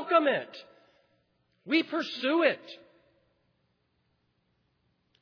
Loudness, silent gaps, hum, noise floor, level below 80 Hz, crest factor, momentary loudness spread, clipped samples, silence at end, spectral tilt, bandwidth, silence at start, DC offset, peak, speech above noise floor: -28 LUFS; none; none; -74 dBFS; -86 dBFS; 22 dB; 23 LU; under 0.1%; 2.45 s; -5 dB/octave; 5.4 kHz; 0 s; under 0.1%; -10 dBFS; 45 dB